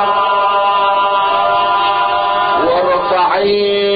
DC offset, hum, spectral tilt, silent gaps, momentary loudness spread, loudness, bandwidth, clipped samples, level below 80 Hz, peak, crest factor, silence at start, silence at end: under 0.1%; none; -9 dB/octave; none; 1 LU; -13 LUFS; 5 kHz; under 0.1%; -48 dBFS; -4 dBFS; 10 dB; 0 s; 0 s